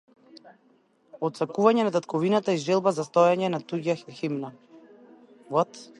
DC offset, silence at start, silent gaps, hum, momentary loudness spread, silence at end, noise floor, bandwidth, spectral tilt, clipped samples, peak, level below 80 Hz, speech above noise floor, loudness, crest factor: under 0.1%; 0.35 s; none; none; 11 LU; 0.15 s; -63 dBFS; 11.5 kHz; -6 dB/octave; under 0.1%; -6 dBFS; -76 dBFS; 39 dB; -25 LUFS; 20 dB